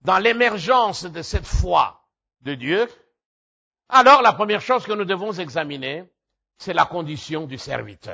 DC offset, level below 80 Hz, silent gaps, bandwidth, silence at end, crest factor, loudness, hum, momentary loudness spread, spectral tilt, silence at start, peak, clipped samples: under 0.1%; -36 dBFS; 3.25-3.71 s; 8 kHz; 0 s; 18 dB; -20 LUFS; none; 16 LU; -4.5 dB/octave; 0.05 s; -2 dBFS; under 0.1%